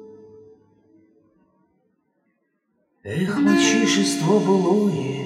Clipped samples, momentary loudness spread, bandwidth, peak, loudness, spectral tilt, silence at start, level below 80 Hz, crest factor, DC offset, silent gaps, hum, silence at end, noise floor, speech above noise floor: under 0.1%; 9 LU; 15.5 kHz; -4 dBFS; -19 LUFS; -4.5 dB/octave; 0 s; -72 dBFS; 18 dB; under 0.1%; none; none; 0 s; -70 dBFS; 52 dB